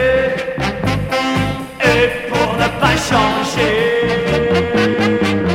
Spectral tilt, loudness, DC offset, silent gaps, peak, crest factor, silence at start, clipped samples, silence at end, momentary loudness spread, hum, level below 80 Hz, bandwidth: -5 dB/octave; -15 LUFS; under 0.1%; none; 0 dBFS; 14 dB; 0 s; under 0.1%; 0 s; 5 LU; none; -34 dBFS; 16.5 kHz